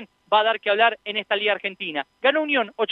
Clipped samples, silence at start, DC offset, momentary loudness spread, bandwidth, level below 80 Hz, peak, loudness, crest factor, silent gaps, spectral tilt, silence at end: under 0.1%; 0 s; under 0.1%; 8 LU; 5.4 kHz; -78 dBFS; -4 dBFS; -22 LUFS; 18 dB; none; -5.5 dB/octave; 0 s